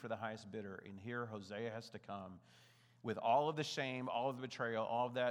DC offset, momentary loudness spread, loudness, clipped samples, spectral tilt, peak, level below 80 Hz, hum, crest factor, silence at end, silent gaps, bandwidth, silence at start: under 0.1%; 15 LU; -42 LUFS; under 0.1%; -5 dB/octave; -22 dBFS; under -90 dBFS; none; 20 dB; 0 s; none; 14 kHz; 0 s